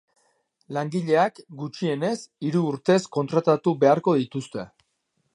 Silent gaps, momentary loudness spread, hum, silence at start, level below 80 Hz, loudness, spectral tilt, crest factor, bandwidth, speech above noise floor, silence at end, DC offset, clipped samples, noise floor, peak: none; 15 LU; none; 0.7 s; -72 dBFS; -23 LUFS; -6.5 dB/octave; 20 dB; 11.5 kHz; 50 dB; 0.7 s; under 0.1%; under 0.1%; -74 dBFS; -4 dBFS